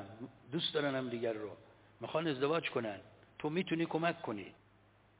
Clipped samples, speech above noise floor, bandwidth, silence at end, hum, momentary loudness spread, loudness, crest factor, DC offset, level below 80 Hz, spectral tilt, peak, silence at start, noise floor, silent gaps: under 0.1%; 30 dB; 4 kHz; 0.65 s; none; 16 LU; -37 LUFS; 20 dB; under 0.1%; -76 dBFS; -4 dB/octave; -20 dBFS; 0 s; -67 dBFS; none